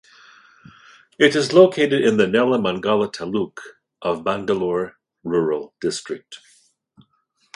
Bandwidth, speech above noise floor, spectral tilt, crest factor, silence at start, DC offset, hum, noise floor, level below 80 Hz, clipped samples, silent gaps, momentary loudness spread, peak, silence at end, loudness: 11.5 kHz; 47 dB; -5 dB/octave; 20 dB; 1.2 s; under 0.1%; none; -66 dBFS; -60 dBFS; under 0.1%; none; 16 LU; 0 dBFS; 1.2 s; -19 LUFS